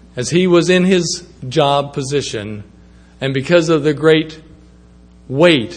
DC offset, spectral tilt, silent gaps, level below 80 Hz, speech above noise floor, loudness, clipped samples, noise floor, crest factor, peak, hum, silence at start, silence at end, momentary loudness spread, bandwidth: under 0.1%; -5 dB/octave; none; -46 dBFS; 29 dB; -15 LUFS; under 0.1%; -44 dBFS; 16 dB; 0 dBFS; none; 0.15 s; 0 s; 13 LU; 9.8 kHz